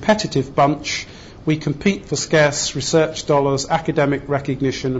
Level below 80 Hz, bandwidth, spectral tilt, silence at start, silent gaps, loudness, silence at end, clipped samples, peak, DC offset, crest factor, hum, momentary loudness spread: -44 dBFS; 8 kHz; -4.5 dB/octave; 0 s; none; -19 LUFS; 0 s; under 0.1%; -4 dBFS; under 0.1%; 14 dB; none; 7 LU